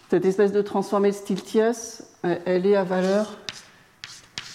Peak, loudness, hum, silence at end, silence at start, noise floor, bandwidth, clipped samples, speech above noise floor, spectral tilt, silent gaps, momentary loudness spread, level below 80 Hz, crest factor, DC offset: -10 dBFS; -23 LUFS; none; 0 s; 0.1 s; -45 dBFS; 14 kHz; under 0.1%; 22 dB; -5.5 dB/octave; none; 16 LU; -68 dBFS; 14 dB; under 0.1%